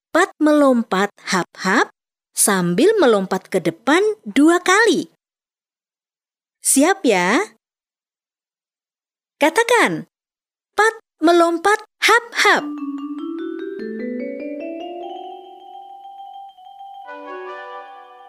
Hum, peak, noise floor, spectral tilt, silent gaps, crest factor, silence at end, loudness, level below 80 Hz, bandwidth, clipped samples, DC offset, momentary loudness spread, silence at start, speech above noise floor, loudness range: none; -2 dBFS; under -90 dBFS; -3.5 dB/octave; none; 18 dB; 0.25 s; -17 LUFS; -68 dBFS; 15.5 kHz; under 0.1%; under 0.1%; 21 LU; 0.15 s; over 74 dB; 14 LU